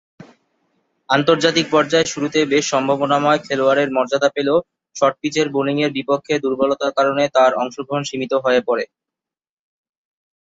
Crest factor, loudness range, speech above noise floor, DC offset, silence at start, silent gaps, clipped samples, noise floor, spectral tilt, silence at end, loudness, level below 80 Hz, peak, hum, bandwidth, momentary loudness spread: 16 dB; 3 LU; 69 dB; under 0.1%; 0.2 s; none; under 0.1%; -86 dBFS; -4 dB/octave; 1.6 s; -18 LUFS; -62 dBFS; -2 dBFS; none; 8 kHz; 7 LU